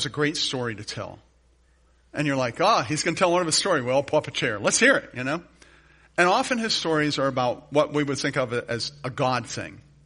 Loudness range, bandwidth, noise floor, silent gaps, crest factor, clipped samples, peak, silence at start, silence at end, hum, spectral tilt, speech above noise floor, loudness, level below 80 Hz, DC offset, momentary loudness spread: 4 LU; 10.5 kHz; -60 dBFS; none; 20 dB; under 0.1%; -4 dBFS; 0 s; 0.25 s; none; -3.5 dB/octave; 36 dB; -24 LUFS; -58 dBFS; under 0.1%; 12 LU